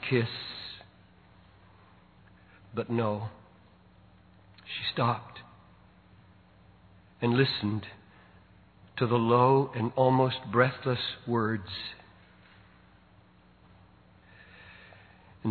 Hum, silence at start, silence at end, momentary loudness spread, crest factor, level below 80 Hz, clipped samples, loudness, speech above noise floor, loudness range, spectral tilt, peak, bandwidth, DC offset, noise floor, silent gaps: none; 0 s; 0 s; 24 LU; 24 dB; -66 dBFS; under 0.1%; -29 LUFS; 32 dB; 11 LU; -9.5 dB/octave; -8 dBFS; 4.6 kHz; under 0.1%; -59 dBFS; none